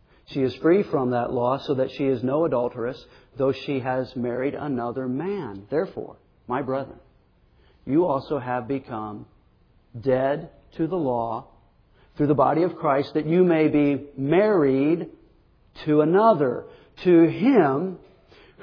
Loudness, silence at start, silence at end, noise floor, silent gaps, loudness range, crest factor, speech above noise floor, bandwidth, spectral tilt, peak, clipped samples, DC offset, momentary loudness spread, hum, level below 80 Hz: -23 LUFS; 0.3 s; 0.65 s; -59 dBFS; none; 8 LU; 18 dB; 37 dB; 5.4 kHz; -9.5 dB/octave; -6 dBFS; under 0.1%; under 0.1%; 14 LU; none; -58 dBFS